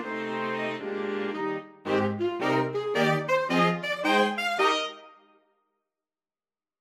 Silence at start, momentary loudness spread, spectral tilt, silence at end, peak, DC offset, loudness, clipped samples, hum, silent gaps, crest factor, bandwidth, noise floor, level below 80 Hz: 0 s; 8 LU; -5 dB/octave; 1.7 s; -10 dBFS; under 0.1%; -27 LUFS; under 0.1%; none; none; 18 dB; 15 kHz; under -90 dBFS; -76 dBFS